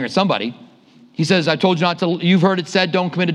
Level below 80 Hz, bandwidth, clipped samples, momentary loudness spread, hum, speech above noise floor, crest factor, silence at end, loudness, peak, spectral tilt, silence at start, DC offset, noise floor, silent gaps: -68 dBFS; 10.5 kHz; under 0.1%; 8 LU; none; 31 dB; 18 dB; 0 s; -17 LUFS; 0 dBFS; -6 dB/octave; 0 s; under 0.1%; -48 dBFS; none